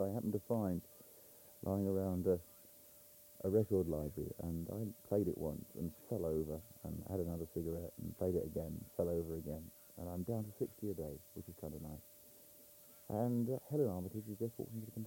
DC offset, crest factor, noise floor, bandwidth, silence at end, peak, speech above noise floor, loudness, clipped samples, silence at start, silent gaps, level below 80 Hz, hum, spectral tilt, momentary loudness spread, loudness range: under 0.1%; 18 dB; -61 dBFS; 17 kHz; 0 s; -22 dBFS; 21 dB; -41 LUFS; under 0.1%; 0 s; none; -62 dBFS; none; -8.5 dB/octave; 21 LU; 5 LU